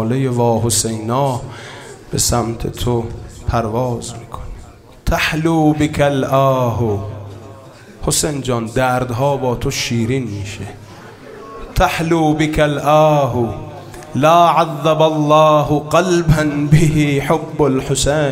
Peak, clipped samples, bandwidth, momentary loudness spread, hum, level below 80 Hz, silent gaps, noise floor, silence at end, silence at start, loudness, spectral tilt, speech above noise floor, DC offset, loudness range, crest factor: 0 dBFS; under 0.1%; 16 kHz; 19 LU; none; -32 dBFS; none; -38 dBFS; 0 s; 0 s; -15 LUFS; -5 dB/octave; 23 dB; under 0.1%; 7 LU; 16 dB